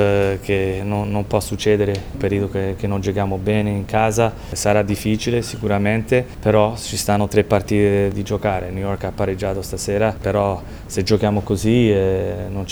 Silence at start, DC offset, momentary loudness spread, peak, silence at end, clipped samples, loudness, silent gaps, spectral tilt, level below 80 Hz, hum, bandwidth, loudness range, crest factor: 0 s; under 0.1%; 7 LU; 0 dBFS; 0 s; under 0.1%; -19 LUFS; none; -6 dB/octave; -36 dBFS; none; over 20 kHz; 2 LU; 18 dB